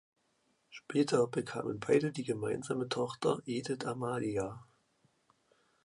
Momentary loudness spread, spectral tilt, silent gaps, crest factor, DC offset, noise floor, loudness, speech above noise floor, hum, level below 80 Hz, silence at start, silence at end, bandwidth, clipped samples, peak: 8 LU; -5.5 dB/octave; none; 20 dB; under 0.1%; -76 dBFS; -34 LUFS; 42 dB; none; -70 dBFS; 0.7 s; 1.2 s; 11.5 kHz; under 0.1%; -16 dBFS